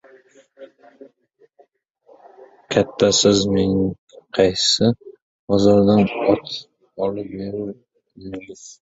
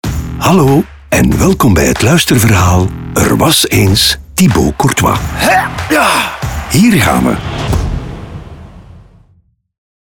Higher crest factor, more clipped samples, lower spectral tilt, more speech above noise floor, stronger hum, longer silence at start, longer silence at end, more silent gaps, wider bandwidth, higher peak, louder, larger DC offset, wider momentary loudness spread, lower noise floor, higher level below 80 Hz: first, 18 dB vs 10 dB; neither; about the same, -4.5 dB/octave vs -4.5 dB/octave; about the same, 41 dB vs 42 dB; neither; first, 0.6 s vs 0.05 s; second, 0.25 s vs 1.05 s; first, 1.90-1.94 s, 3.98-4.07 s, 5.22-5.48 s vs none; second, 8 kHz vs 19.5 kHz; about the same, -2 dBFS vs 0 dBFS; second, -18 LUFS vs -10 LUFS; neither; first, 20 LU vs 9 LU; first, -59 dBFS vs -51 dBFS; second, -48 dBFS vs -26 dBFS